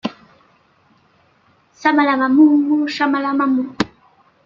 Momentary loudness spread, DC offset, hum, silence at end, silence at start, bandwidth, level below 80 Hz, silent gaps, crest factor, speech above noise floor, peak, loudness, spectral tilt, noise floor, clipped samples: 12 LU; under 0.1%; none; 0.6 s; 0.05 s; 7.4 kHz; -60 dBFS; none; 18 dB; 42 dB; 0 dBFS; -16 LUFS; -5.5 dB/octave; -56 dBFS; under 0.1%